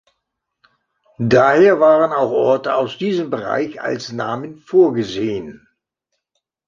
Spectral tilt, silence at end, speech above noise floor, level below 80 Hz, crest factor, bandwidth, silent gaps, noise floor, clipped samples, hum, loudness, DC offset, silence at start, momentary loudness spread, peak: -6.5 dB/octave; 1.1 s; 60 dB; -56 dBFS; 16 dB; 7.4 kHz; none; -76 dBFS; under 0.1%; none; -16 LUFS; under 0.1%; 1.2 s; 13 LU; 0 dBFS